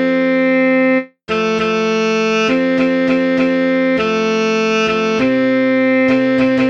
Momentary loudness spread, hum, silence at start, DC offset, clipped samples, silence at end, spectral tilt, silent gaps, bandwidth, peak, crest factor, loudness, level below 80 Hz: 3 LU; none; 0 s; under 0.1%; under 0.1%; 0 s; -5.5 dB/octave; none; 7.4 kHz; -4 dBFS; 10 dB; -14 LUFS; -52 dBFS